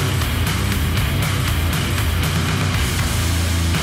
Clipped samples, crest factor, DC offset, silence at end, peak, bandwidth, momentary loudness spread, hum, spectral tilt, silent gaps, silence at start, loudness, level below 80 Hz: under 0.1%; 10 dB; under 0.1%; 0 s; -8 dBFS; 16.5 kHz; 1 LU; none; -4.5 dB/octave; none; 0 s; -19 LUFS; -26 dBFS